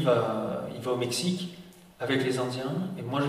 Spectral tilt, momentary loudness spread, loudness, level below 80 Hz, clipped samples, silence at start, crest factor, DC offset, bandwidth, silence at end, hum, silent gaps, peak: -5 dB/octave; 9 LU; -30 LUFS; -66 dBFS; under 0.1%; 0 s; 18 dB; under 0.1%; 15.5 kHz; 0 s; none; none; -12 dBFS